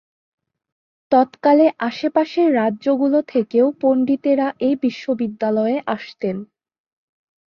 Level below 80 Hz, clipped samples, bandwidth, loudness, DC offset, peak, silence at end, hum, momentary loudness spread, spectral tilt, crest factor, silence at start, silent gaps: -66 dBFS; under 0.1%; 6.8 kHz; -18 LUFS; under 0.1%; -2 dBFS; 1 s; none; 8 LU; -7.5 dB/octave; 16 dB; 1.1 s; none